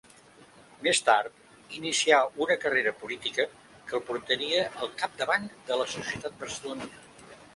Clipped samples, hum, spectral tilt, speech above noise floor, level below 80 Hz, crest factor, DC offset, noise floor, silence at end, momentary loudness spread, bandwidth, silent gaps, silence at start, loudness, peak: under 0.1%; none; -1.5 dB/octave; 26 dB; -68 dBFS; 24 dB; under 0.1%; -55 dBFS; 0.1 s; 14 LU; 11.5 kHz; none; 0.4 s; -28 LUFS; -6 dBFS